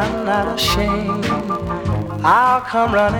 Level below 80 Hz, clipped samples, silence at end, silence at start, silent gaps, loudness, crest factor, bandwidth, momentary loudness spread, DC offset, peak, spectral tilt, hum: -34 dBFS; under 0.1%; 0 s; 0 s; none; -17 LUFS; 16 dB; over 20 kHz; 8 LU; under 0.1%; -2 dBFS; -5 dB/octave; none